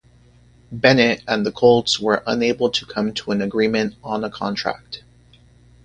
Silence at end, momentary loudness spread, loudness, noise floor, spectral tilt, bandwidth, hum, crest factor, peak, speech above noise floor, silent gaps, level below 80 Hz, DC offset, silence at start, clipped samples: 0.85 s; 12 LU; -19 LUFS; -51 dBFS; -4.5 dB/octave; 10 kHz; 60 Hz at -40 dBFS; 20 dB; 0 dBFS; 32 dB; none; -52 dBFS; under 0.1%; 0.7 s; under 0.1%